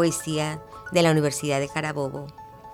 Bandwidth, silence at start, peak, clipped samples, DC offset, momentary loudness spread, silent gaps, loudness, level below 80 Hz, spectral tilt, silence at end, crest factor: 16.5 kHz; 0 s; -6 dBFS; under 0.1%; under 0.1%; 17 LU; none; -25 LUFS; -56 dBFS; -5 dB/octave; 0 s; 18 dB